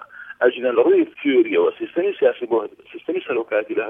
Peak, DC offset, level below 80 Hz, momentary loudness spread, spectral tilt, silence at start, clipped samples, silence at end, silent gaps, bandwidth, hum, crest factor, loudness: -4 dBFS; under 0.1%; -74 dBFS; 11 LU; -7.5 dB/octave; 0.15 s; under 0.1%; 0 s; none; 3.7 kHz; none; 16 dB; -20 LUFS